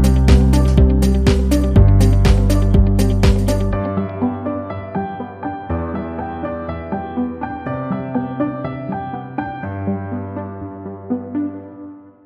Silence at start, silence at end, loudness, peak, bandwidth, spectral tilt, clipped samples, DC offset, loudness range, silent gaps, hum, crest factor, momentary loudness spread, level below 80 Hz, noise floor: 0 s; 0.25 s; -18 LUFS; -2 dBFS; 14.5 kHz; -7.5 dB/octave; under 0.1%; under 0.1%; 11 LU; none; none; 14 dB; 14 LU; -20 dBFS; -37 dBFS